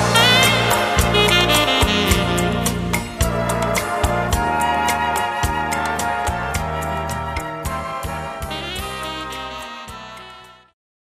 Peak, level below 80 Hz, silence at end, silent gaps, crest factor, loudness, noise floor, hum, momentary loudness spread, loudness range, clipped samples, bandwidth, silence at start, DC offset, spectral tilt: 0 dBFS; -32 dBFS; 0.5 s; none; 20 dB; -18 LUFS; -42 dBFS; none; 14 LU; 11 LU; under 0.1%; 15.5 kHz; 0 s; under 0.1%; -3.5 dB/octave